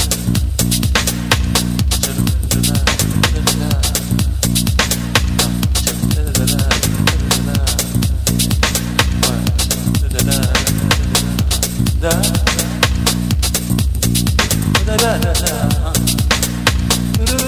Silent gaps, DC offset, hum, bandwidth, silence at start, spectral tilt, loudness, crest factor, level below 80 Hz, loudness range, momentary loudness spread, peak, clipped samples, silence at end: none; under 0.1%; none; 16 kHz; 0 s; -4 dB/octave; -15 LUFS; 14 dB; -20 dBFS; 0 LU; 2 LU; 0 dBFS; under 0.1%; 0 s